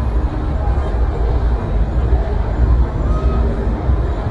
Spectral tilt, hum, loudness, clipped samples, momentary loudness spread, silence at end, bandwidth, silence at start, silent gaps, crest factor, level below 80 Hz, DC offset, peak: -9 dB/octave; none; -18 LUFS; under 0.1%; 3 LU; 0 s; 4.7 kHz; 0 s; none; 12 dB; -16 dBFS; under 0.1%; -4 dBFS